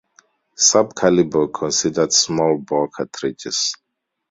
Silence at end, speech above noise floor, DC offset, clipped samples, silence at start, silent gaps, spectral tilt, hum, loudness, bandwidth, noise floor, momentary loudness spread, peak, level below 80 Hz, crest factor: 0.55 s; 39 dB; under 0.1%; under 0.1%; 0.6 s; none; -3 dB/octave; none; -18 LUFS; 8 kHz; -57 dBFS; 11 LU; -2 dBFS; -56 dBFS; 18 dB